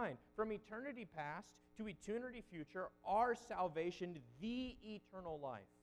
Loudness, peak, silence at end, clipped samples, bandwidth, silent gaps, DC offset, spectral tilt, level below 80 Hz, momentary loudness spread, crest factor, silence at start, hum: -46 LUFS; -26 dBFS; 0.15 s; under 0.1%; 12 kHz; none; under 0.1%; -6 dB/octave; -70 dBFS; 12 LU; 20 dB; 0 s; none